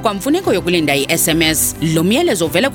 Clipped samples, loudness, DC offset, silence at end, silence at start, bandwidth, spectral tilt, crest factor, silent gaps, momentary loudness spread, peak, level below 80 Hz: under 0.1%; -14 LUFS; under 0.1%; 0 s; 0 s; 18.5 kHz; -3.5 dB/octave; 14 dB; none; 3 LU; 0 dBFS; -38 dBFS